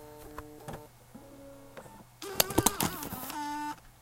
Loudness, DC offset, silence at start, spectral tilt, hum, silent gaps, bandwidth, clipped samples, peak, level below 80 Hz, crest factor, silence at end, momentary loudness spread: -31 LUFS; under 0.1%; 0 s; -3 dB/octave; none; none; 17 kHz; under 0.1%; -4 dBFS; -54 dBFS; 32 dB; 0.1 s; 24 LU